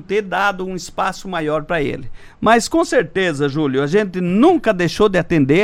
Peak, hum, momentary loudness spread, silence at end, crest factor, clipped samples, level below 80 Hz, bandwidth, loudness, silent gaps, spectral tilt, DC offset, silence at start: -2 dBFS; none; 8 LU; 0 s; 14 dB; under 0.1%; -40 dBFS; 15.5 kHz; -17 LUFS; none; -5.5 dB/octave; under 0.1%; 0 s